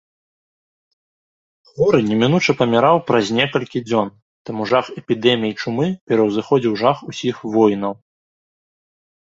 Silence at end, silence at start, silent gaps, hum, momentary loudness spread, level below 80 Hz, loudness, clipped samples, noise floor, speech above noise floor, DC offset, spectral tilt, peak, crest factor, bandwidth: 1.45 s; 1.75 s; 4.22-4.45 s, 6.01-6.07 s; none; 9 LU; -58 dBFS; -18 LUFS; under 0.1%; under -90 dBFS; over 73 dB; under 0.1%; -6 dB/octave; 0 dBFS; 20 dB; 7.8 kHz